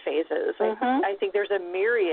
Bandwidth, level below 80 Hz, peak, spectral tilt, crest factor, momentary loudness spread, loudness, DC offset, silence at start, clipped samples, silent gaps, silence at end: 4.3 kHz; -72 dBFS; -10 dBFS; -8 dB/octave; 14 dB; 3 LU; -26 LUFS; under 0.1%; 0 s; under 0.1%; none; 0 s